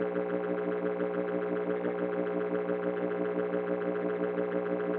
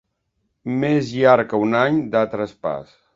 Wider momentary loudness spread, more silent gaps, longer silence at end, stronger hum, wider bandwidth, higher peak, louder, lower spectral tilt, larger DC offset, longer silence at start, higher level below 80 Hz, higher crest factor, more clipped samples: second, 1 LU vs 12 LU; neither; second, 0 s vs 0.35 s; first, 60 Hz at -40 dBFS vs none; second, 4.2 kHz vs 7.6 kHz; second, -18 dBFS vs 0 dBFS; second, -32 LUFS vs -19 LUFS; about the same, -7 dB/octave vs -7 dB/octave; neither; second, 0 s vs 0.65 s; second, -82 dBFS vs -58 dBFS; second, 14 dB vs 20 dB; neither